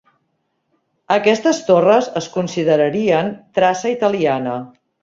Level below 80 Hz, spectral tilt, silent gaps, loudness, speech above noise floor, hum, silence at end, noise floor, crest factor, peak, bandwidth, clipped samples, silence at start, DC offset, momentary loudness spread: -60 dBFS; -5 dB/octave; none; -16 LUFS; 53 dB; none; 0.35 s; -69 dBFS; 16 dB; -2 dBFS; 7.8 kHz; under 0.1%; 1.1 s; under 0.1%; 8 LU